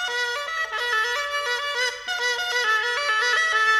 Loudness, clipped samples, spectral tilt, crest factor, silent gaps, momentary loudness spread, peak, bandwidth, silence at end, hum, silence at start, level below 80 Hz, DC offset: -22 LUFS; under 0.1%; 2.5 dB/octave; 14 dB; none; 6 LU; -10 dBFS; 16 kHz; 0 s; none; 0 s; -62 dBFS; under 0.1%